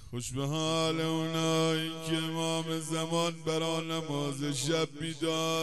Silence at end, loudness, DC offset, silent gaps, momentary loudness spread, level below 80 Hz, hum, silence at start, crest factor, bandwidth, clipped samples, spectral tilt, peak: 0 s; -31 LUFS; 0.3%; none; 5 LU; -62 dBFS; none; 0 s; 16 dB; 13 kHz; under 0.1%; -4.5 dB/octave; -16 dBFS